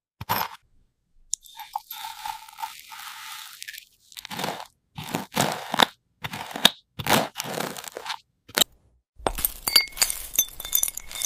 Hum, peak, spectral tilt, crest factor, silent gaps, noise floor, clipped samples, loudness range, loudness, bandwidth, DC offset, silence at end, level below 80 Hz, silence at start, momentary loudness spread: none; 0 dBFS; -1.5 dB/octave; 28 dB; 9.09-9.13 s; -63 dBFS; under 0.1%; 12 LU; -25 LUFS; 16 kHz; under 0.1%; 0 s; -50 dBFS; 0.2 s; 18 LU